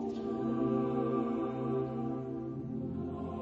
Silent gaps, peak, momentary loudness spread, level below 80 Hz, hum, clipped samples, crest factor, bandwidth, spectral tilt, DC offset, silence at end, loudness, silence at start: none; -20 dBFS; 7 LU; -60 dBFS; none; under 0.1%; 14 dB; 7.4 kHz; -10 dB/octave; under 0.1%; 0 s; -35 LUFS; 0 s